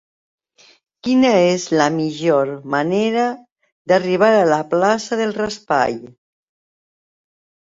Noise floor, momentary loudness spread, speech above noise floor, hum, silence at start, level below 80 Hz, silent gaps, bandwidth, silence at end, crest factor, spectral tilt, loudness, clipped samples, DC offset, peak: under -90 dBFS; 9 LU; over 74 dB; none; 1.05 s; -60 dBFS; 3.52-3.56 s, 3.72-3.85 s; 8 kHz; 1.55 s; 16 dB; -5 dB/octave; -17 LUFS; under 0.1%; under 0.1%; -2 dBFS